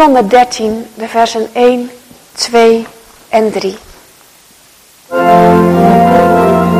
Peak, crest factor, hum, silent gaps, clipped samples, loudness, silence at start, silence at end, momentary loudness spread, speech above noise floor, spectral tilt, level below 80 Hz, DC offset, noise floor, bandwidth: 0 dBFS; 10 dB; none; none; 1%; -9 LUFS; 0 s; 0 s; 14 LU; 32 dB; -6 dB/octave; -42 dBFS; under 0.1%; -42 dBFS; 15.5 kHz